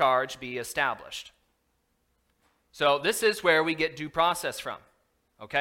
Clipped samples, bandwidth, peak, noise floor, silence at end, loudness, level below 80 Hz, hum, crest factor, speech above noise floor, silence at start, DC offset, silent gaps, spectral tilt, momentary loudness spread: under 0.1%; 16.5 kHz; -8 dBFS; -73 dBFS; 0 s; -27 LUFS; -62 dBFS; none; 20 dB; 46 dB; 0 s; under 0.1%; none; -3 dB/octave; 15 LU